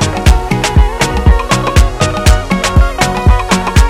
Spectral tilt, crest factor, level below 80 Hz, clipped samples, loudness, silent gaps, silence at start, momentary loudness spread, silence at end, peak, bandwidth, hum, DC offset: -5 dB/octave; 10 dB; -12 dBFS; 4%; -11 LUFS; none; 0 s; 2 LU; 0 s; 0 dBFS; 15 kHz; none; under 0.1%